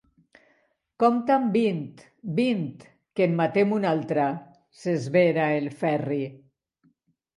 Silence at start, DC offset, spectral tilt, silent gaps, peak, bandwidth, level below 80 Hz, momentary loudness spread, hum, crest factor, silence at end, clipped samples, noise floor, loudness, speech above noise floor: 1 s; under 0.1%; -7.5 dB/octave; none; -8 dBFS; 11.5 kHz; -72 dBFS; 14 LU; none; 18 dB; 1 s; under 0.1%; -68 dBFS; -25 LUFS; 44 dB